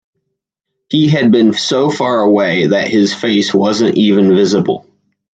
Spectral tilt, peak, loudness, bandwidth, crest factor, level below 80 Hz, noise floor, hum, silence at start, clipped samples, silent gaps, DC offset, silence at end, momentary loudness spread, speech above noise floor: -5.5 dB/octave; 0 dBFS; -12 LUFS; 9 kHz; 12 dB; -58 dBFS; -75 dBFS; none; 0.9 s; under 0.1%; none; under 0.1%; 0.55 s; 4 LU; 64 dB